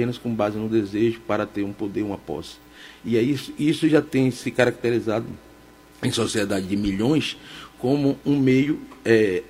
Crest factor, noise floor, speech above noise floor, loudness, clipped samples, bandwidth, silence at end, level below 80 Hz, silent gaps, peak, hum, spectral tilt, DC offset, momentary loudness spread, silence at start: 20 dB; -49 dBFS; 26 dB; -23 LUFS; under 0.1%; 16 kHz; 0.05 s; -52 dBFS; none; -2 dBFS; none; -6 dB/octave; under 0.1%; 14 LU; 0 s